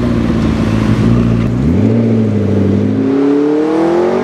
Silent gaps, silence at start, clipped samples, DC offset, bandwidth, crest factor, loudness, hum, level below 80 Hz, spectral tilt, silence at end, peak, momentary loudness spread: none; 0 s; under 0.1%; under 0.1%; 9.8 kHz; 10 dB; -12 LUFS; none; -26 dBFS; -8.5 dB/octave; 0 s; 0 dBFS; 2 LU